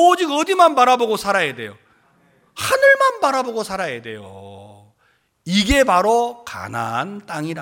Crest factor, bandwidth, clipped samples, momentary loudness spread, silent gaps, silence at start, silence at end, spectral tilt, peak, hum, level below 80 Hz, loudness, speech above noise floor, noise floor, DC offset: 18 dB; 17 kHz; under 0.1%; 20 LU; none; 0 s; 0 s; -4 dB/octave; -2 dBFS; none; -40 dBFS; -17 LUFS; 45 dB; -62 dBFS; under 0.1%